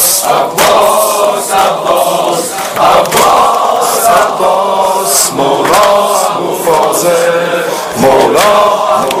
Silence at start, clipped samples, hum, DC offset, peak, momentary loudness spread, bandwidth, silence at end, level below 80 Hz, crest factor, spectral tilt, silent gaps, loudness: 0 s; 0.6%; none; under 0.1%; 0 dBFS; 5 LU; over 20 kHz; 0 s; -44 dBFS; 8 dB; -2 dB/octave; none; -8 LUFS